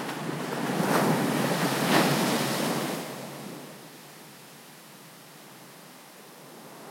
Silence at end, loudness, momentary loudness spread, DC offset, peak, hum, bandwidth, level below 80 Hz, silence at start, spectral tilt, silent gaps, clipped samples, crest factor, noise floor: 0 s; -27 LUFS; 23 LU; under 0.1%; -10 dBFS; none; 16.5 kHz; -76 dBFS; 0 s; -4.5 dB/octave; none; under 0.1%; 20 dB; -49 dBFS